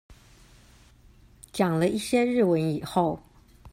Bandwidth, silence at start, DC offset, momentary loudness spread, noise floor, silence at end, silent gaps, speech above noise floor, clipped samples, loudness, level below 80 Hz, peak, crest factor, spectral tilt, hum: 16 kHz; 0.1 s; under 0.1%; 7 LU; -55 dBFS; 0.05 s; none; 31 dB; under 0.1%; -25 LUFS; -56 dBFS; -10 dBFS; 18 dB; -6 dB/octave; none